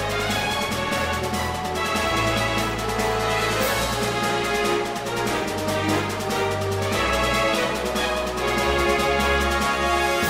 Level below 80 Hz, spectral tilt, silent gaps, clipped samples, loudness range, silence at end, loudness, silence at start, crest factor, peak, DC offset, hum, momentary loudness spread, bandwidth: -36 dBFS; -4 dB/octave; none; under 0.1%; 2 LU; 0 s; -22 LUFS; 0 s; 14 dB; -8 dBFS; under 0.1%; none; 4 LU; 16 kHz